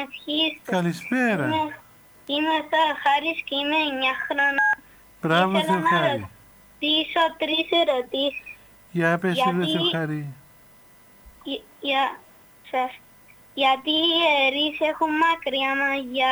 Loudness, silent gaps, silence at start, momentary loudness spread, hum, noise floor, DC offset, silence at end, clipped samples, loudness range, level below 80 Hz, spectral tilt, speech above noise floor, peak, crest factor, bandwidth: -23 LUFS; none; 0 s; 12 LU; none; -52 dBFS; under 0.1%; 0 s; under 0.1%; 6 LU; -62 dBFS; -5 dB/octave; 29 dB; -6 dBFS; 18 dB; over 20 kHz